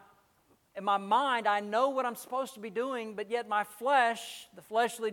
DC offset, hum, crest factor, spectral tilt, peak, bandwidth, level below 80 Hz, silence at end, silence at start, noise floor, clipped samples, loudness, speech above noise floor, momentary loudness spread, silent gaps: under 0.1%; none; 18 dB; -3 dB/octave; -14 dBFS; 18 kHz; -84 dBFS; 0 s; 0.75 s; -68 dBFS; under 0.1%; -31 LUFS; 37 dB; 10 LU; none